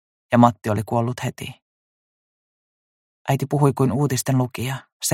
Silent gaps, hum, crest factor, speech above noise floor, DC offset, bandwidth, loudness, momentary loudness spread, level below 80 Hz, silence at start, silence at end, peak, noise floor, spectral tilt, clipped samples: 1.62-3.25 s, 4.92-5.00 s; none; 22 dB; over 70 dB; under 0.1%; 16.5 kHz; -21 LUFS; 13 LU; -58 dBFS; 0.3 s; 0 s; -2 dBFS; under -90 dBFS; -6 dB/octave; under 0.1%